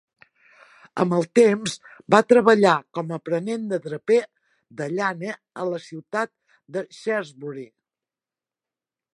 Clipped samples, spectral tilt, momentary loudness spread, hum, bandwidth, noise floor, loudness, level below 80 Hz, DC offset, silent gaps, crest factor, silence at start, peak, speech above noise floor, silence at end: under 0.1%; -5.5 dB/octave; 19 LU; none; 11.5 kHz; under -90 dBFS; -22 LUFS; -72 dBFS; under 0.1%; none; 22 dB; 0.95 s; 0 dBFS; over 68 dB; 1.5 s